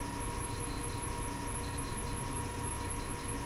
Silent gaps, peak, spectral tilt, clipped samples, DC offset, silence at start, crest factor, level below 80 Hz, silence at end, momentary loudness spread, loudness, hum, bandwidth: none; -26 dBFS; -4 dB/octave; under 0.1%; under 0.1%; 0 s; 12 dB; -44 dBFS; 0 s; 1 LU; -38 LUFS; none; 16 kHz